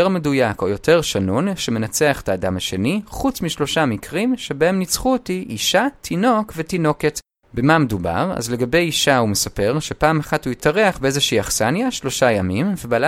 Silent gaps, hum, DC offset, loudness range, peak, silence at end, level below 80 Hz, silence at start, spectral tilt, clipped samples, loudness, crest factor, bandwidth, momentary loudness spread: none; none; under 0.1%; 2 LU; 0 dBFS; 0 s; -42 dBFS; 0 s; -4.5 dB/octave; under 0.1%; -19 LUFS; 18 dB; 16.5 kHz; 6 LU